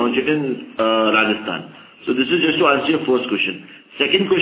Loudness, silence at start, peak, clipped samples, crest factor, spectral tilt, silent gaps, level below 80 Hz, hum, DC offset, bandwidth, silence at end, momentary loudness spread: -18 LUFS; 0 s; -2 dBFS; under 0.1%; 16 dB; -9 dB/octave; none; -60 dBFS; none; under 0.1%; 4 kHz; 0 s; 12 LU